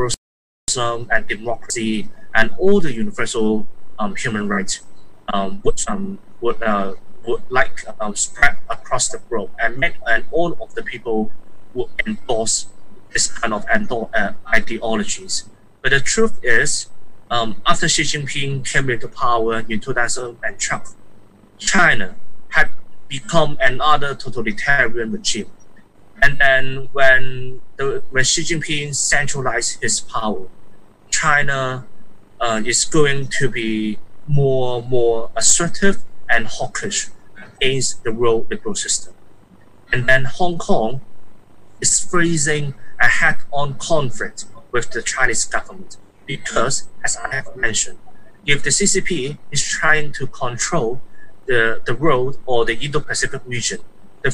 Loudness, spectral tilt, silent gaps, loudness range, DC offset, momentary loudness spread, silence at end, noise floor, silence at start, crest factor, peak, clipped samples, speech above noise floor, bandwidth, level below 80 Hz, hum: -19 LUFS; -3 dB/octave; 0.17-0.67 s; 4 LU; under 0.1%; 11 LU; 0 s; -46 dBFS; 0 s; 16 dB; 0 dBFS; under 0.1%; 31 dB; 11.5 kHz; -36 dBFS; none